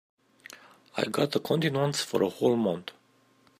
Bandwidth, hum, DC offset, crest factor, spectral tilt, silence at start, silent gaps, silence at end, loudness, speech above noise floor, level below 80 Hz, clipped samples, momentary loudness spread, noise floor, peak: 15.5 kHz; none; under 0.1%; 20 dB; -5 dB/octave; 0.5 s; none; 0.7 s; -28 LUFS; 36 dB; -72 dBFS; under 0.1%; 21 LU; -64 dBFS; -10 dBFS